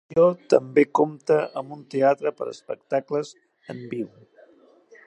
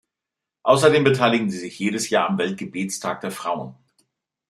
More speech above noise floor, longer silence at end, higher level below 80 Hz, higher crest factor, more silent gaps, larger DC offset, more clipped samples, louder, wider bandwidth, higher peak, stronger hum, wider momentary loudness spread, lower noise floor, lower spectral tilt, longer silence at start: second, 32 dB vs 65 dB; first, 1 s vs 0.75 s; second, -72 dBFS vs -64 dBFS; about the same, 22 dB vs 20 dB; neither; neither; neither; about the same, -23 LUFS vs -21 LUFS; second, 8.8 kHz vs 13.5 kHz; about the same, -2 dBFS vs -2 dBFS; neither; first, 16 LU vs 12 LU; second, -55 dBFS vs -86 dBFS; first, -6.5 dB/octave vs -4.5 dB/octave; second, 0.1 s vs 0.65 s